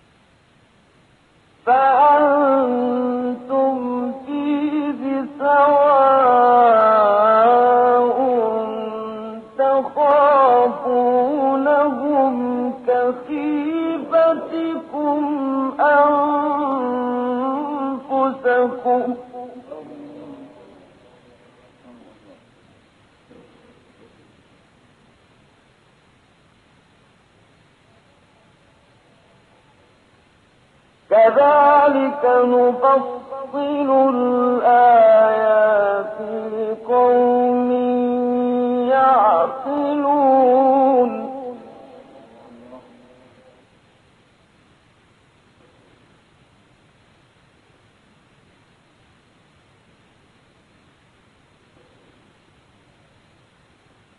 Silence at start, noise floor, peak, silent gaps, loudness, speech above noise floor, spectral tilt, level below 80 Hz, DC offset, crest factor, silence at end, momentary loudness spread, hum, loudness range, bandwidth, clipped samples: 1.65 s; -55 dBFS; -4 dBFS; none; -16 LUFS; 40 dB; -7.5 dB/octave; -66 dBFS; under 0.1%; 14 dB; 11.4 s; 14 LU; none; 7 LU; 4.5 kHz; under 0.1%